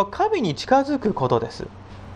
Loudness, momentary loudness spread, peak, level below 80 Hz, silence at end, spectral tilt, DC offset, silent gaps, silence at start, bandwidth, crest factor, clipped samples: -22 LUFS; 17 LU; -6 dBFS; -48 dBFS; 0 s; -6 dB/octave; under 0.1%; none; 0 s; 11 kHz; 18 dB; under 0.1%